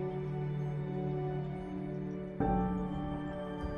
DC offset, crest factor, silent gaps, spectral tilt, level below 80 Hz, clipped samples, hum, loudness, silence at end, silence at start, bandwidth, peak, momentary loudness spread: under 0.1%; 16 dB; none; -10 dB/octave; -48 dBFS; under 0.1%; none; -37 LUFS; 0 s; 0 s; 5 kHz; -20 dBFS; 7 LU